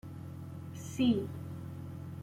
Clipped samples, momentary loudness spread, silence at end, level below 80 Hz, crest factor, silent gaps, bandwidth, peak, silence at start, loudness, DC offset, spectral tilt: under 0.1%; 15 LU; 0 s; -66 dBFS; 18 dB; none; 16 kHz; -18 dBFS; 0.05 s; -37 LUFS; under 0.1%; -6.5 dB/octave